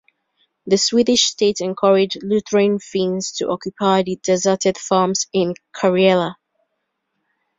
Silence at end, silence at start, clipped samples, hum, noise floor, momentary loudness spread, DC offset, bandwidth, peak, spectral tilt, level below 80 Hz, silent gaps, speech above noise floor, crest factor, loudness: 1.25 s; 0.65 s; under 0.1%; none; -74 dBFS; 8 LU; under 0.1%; 7.8 kHz; -2 dBFS; -4 dB/octave; -60 dBFS; none; 57 dB; 16 dB; -18 LUFS